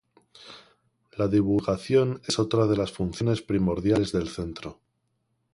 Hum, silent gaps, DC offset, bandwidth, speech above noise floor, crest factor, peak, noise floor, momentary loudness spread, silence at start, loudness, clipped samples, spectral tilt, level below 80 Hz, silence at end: none; none; under 0.1%; 11.5 kHz; 50 dB; 16 dB; -10 dBFS; -75 dBFS; 18 LU; 0.4 s; -26 LUFS; under 0.1%; -6.5 dB/octave; -48 dBFS; 0.8 s